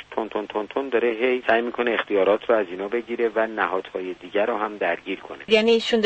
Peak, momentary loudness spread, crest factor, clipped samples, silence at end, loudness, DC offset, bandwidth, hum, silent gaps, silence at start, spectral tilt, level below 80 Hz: -4 dBFS; 9 LU; 20 dB; under 0.1%; 0 s; -23 LUFS; under 0.1%; 8.6 kHz; none; none; 0 s; -4.5 dB/octave; -62 dBFS